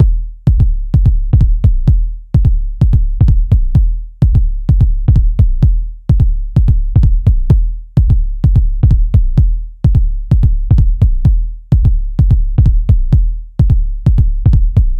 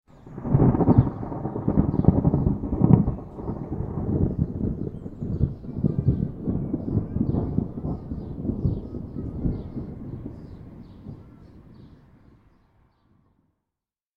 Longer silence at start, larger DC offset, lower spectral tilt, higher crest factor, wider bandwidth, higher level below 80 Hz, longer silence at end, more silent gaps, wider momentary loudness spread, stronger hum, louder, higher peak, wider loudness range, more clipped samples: second, 0 s vs 0.25 s; neither; second, -10.5 dB/octave vs -13 dB/octave; second, 10 dB vs 24 dB; second, 1.9 kHz vs 2.6 kHz; first, -12 dBFS vs -36 dBFS; second, 0 s vs 2.3 s; neither; second, 4 LU vs 18 LU; neither; first, -13 LUFS vs -25 LUFS; about the same, 0 dBFS vs -2 dBFS; second, 1 LU vs 15 LU; neither